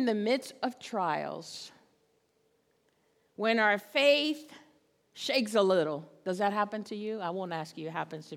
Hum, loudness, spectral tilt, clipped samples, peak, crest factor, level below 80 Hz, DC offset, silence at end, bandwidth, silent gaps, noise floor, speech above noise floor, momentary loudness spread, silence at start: none; -30 LUFS; -4.5 dB/octave; under 0.1%; -12 dBFS; 20 dB; -88 dBFS; under 0.1%; 0 s; 17 kHz; none; -72 dBFS; 42 dB; 13 LU; 0 s